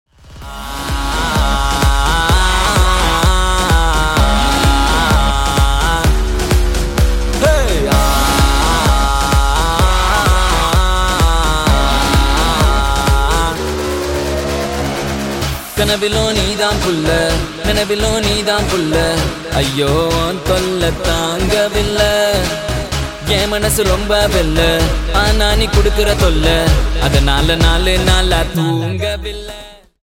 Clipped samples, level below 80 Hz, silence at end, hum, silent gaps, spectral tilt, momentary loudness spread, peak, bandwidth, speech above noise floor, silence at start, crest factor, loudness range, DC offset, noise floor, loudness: under 0.1%; -16 dBFS; 0.3 s; none; none; -4 dB/octave; 6 LU; 0 dBFS; 17 kHz; 21 dB; 0.3 s; 12 dB; 3 LU; under 0.1%; -34 dBFS; -14 LUFS